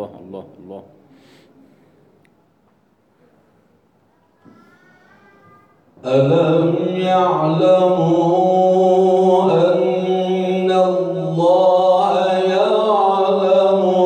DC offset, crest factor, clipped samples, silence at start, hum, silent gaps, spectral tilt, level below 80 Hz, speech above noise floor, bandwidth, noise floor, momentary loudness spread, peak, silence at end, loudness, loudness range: under 0.1%; 14 dB; under 0.1%; 0 s; none; none; -7.5 dB/octave; -68 dBFS; 43 dB; 9 kHz; -58 dBFS; 7 LU; -4 dBFS; 0 s; -15 LUFS; 6 LU